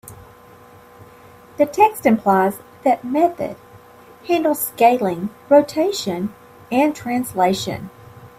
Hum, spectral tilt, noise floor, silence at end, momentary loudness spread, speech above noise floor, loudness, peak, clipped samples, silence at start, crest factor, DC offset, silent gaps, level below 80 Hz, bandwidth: none; -5 dB/octave; -45 dBFS; 0.1 s; 13 LU; 27 dB; -19 LUFS; -2 dBFS; under 0.1%; 0.05 s; 18 dB; under 0.1%; none; -58 dBFS; 16 kHz